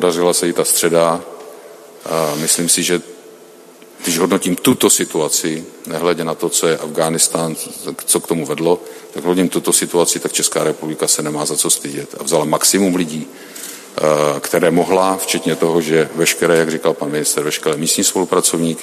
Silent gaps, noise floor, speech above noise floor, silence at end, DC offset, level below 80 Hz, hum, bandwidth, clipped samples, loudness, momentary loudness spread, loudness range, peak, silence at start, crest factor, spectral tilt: none; -41 dBFS; 25 dB; 0 s; under 0.1%; -60 dBFS; none; 14.5 kHz; under 0.1%; -15 LUFS; 11 LU; 2 LU; 0 dBFS; 0 s; 16 dB; -3 dB/octave